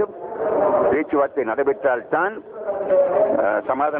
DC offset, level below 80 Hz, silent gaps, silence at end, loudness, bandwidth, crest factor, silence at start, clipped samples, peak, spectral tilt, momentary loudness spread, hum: under 0.1%; -58 dBFS; none; 0 s; -20 LUFS; 3.8 kHz; 12 dB; 0 s; under 0.1%; -8 dBFS; -10 dB/octave; 8 LU; none